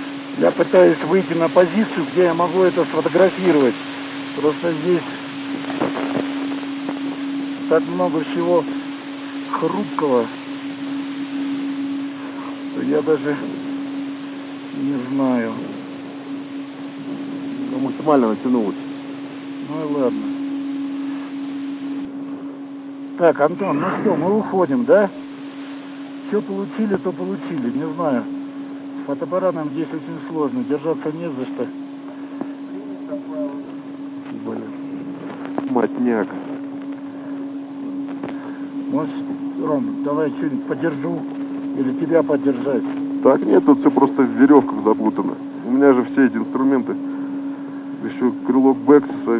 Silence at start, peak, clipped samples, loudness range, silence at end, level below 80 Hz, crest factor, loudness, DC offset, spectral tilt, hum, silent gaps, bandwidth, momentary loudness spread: 0 s; 0 dBFS; under 0.1%; 9 LU; 0 s; -72 dBFS; 20 dB; -20 LUFS; under 0.1%; -11 dB/octave; none; none; 4 kHz; 15 LU